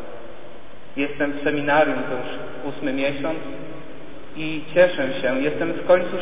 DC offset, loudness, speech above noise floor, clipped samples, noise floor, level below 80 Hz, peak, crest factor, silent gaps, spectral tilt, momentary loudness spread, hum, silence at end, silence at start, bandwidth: 4%; -22 LUFS; 21 dB; under 0.1%; -43 dBFS; -54 dBFS; -4 dBFS; 20 dB; none; -9.5 dB/octave; 21 LU; none; 0 s; 0 s; 3.9 kHz